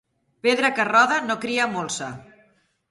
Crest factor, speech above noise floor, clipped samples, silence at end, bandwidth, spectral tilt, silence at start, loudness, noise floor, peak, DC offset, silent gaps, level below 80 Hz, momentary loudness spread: 20 dB; 40 dB; under 0.1%; 0.65 s; 11.5 kHz; -3 dB/octave; 0.45 s; -21 LUFS; -62 dBFS; -4 dBFS; under 0.1%; none; -66 dBFS; 12 LU